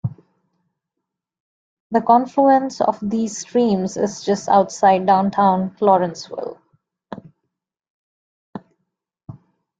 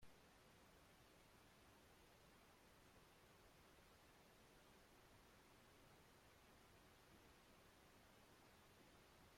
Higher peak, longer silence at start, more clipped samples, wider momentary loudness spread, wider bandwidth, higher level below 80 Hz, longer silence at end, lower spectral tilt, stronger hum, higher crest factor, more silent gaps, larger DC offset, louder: first, -2 dBFS vs -54 dBFS; about the same, 0.05 s vs 0 s; neither; first, 23 LU vs 0 LU; second, 9.2 kHz vs 16 kHz; first, -62 dBFS vs -80 dBFS; first, 0.5 s vs 0 s; first, -6 dB/octave vs -3.5 dB/octave; neither; about the same, 18 dB vs 16 dB; first, 1.40-1.90 s, 7.90-8.53 s vs none; neither; first, -18 LUFS vs -70 LUFS